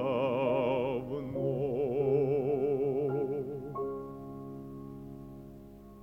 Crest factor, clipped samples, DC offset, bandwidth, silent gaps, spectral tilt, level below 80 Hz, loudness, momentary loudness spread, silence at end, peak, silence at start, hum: 14 dB; under 0.1%; under 0.1%; 15 kHz; none; -9 dB/octave; -60 dBFS; -32 LUFS; 18 LU; 0 s; -18 dBFS; 0 s; none